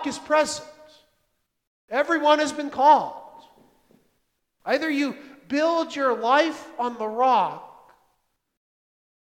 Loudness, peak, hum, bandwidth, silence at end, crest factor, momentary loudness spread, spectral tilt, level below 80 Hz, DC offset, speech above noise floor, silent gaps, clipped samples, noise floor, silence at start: -23 LUFS; -4 dBFS; none; 15.5 kHz; 1.5 s; 22 dB; 14 LU; -3 dB/octave; -70 dBFS; under 0.1%; 51 dB; 1.67-1.88 s; under 0.1%; -73 dBFS; 0 s